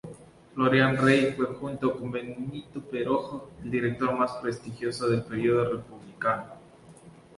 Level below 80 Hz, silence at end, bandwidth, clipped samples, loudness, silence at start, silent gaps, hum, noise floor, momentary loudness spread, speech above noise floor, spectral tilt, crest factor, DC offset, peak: -60 dBFS; 0.3 s; 11.5 kHz; under 0.1%; -27 LUFS; 0.05 s; none; none; -51 dBFS; 16 LU; 24 dB; -6.5 dB/octave; 20 dB; under 0.1%; -8 dBFS